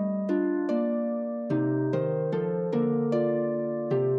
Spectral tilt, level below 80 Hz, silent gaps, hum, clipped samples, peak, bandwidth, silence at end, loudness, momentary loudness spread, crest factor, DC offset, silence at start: -10.5 dB/octave; -74 dBFS; none; none; under 0.1%; -14 dBFS; 6.4 kHz; 0 s; -28 LUFS; 3 LU; 12 dB; under 0.1%; 0 s